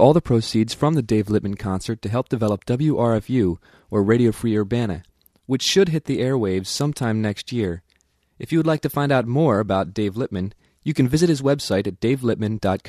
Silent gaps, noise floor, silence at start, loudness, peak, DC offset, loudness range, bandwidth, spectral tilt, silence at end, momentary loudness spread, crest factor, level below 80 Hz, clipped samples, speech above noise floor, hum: none; -64 dBFS; 0 s; -21 LUFS; -2 dBFS; under 0.1%; 2 LU; 14 kHz; -6 dB/octave; 0 s; 8 LU; 20 dB; -48 dBFS; under 0.1%; 44 dB; none